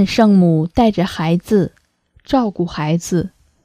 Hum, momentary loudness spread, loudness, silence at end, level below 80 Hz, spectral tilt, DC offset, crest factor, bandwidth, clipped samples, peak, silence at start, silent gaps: none; 9 LU; -16 LUFS; 0.35 s; -40 dBFS; -7 dB/octave; under 0.1%; 16 dB; 14.5 kHz; under 0.1%; 0 dBFS; 0 s; none